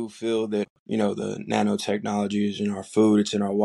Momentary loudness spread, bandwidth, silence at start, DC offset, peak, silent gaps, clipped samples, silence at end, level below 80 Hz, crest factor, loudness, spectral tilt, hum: 9 LU; 12 kHz; 0 s; under 0.1%; -6 dBFS; 0.70-0.86 s; under 0.1%; 0 s; -68 dBFS; 18 dB; -25 LUFS; -6 dB/octave; none